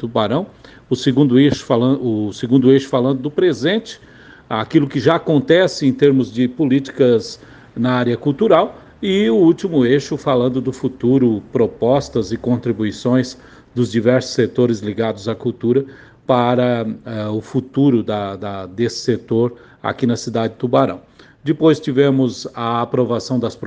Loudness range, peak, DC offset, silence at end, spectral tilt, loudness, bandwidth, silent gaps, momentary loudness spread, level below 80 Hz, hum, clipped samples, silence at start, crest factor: 4 LU; 0 dBFS; under 0.1%; 0 s; -7 dB/octave; -17 LUFS; 9.2 kHz; none; 10 LU; -52 dBFS; none; under 0.1%; 0 s; 16 dB